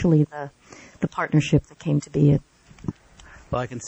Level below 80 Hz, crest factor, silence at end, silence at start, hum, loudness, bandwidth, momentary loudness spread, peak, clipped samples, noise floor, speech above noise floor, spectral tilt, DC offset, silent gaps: -46 dBFS; 16 dB; 0 s; 0 s; none; -23 LUFS; 8.2 kHz; 16 LU; -8 dBFS; under 0.1%; -48 dBFS; 27 dB; -7.5 dB/octave; under 0.1%; none